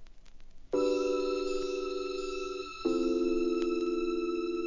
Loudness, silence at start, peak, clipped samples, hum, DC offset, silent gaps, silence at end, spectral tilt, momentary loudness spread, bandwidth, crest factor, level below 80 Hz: -32 LUFS; 0 s; -18 dBFS; under 0.1%; none; 0.2%; none; 0 s; -4.5 dB/octave; 6 LU; 7.4 kHz; 14 dB; -54 dBFS